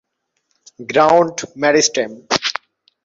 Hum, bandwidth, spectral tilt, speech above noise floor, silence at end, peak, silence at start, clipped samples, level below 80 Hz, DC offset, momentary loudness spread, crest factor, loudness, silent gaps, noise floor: none; 8 kHz; -2.5 dB/octave; 54 dB; 0.55 s; 0 dBFS; 0.8 s; under 0.1%; -58 dBFS; under 0.1%; 10 LU; 18 dB; -16 LUFS; none; -70 dBFS